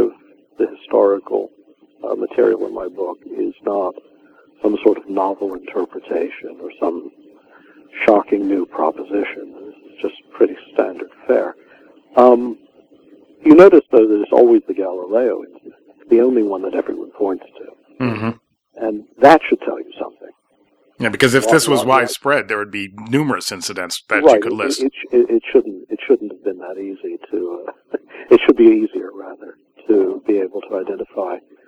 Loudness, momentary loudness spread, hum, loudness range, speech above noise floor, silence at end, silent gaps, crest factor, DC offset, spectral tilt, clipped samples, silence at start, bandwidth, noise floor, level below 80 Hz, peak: -16 LUFS; 16 LU; none; 8 LU; 43 dB; 0.3 s; none; 16 dB; under 0.1%; -5 dB/octave; 0.1%; 0 s; 14.5 kHz; -59 dBFS; -58 dBFS; 0 dBFS